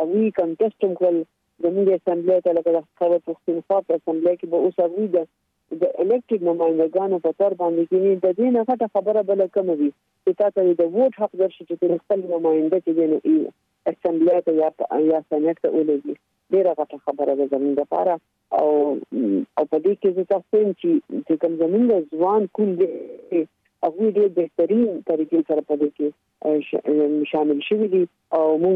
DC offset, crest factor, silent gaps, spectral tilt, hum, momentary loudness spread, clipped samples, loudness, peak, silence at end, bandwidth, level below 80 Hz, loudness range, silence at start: under 0.1%; 12 dB; none; -10 dB/octave; none; 6 LU; under 0.1%; -21 LUFS; -8 dBFS; 0 s; 3.9 kHz; -72 dBFS; 2 LU; 0 s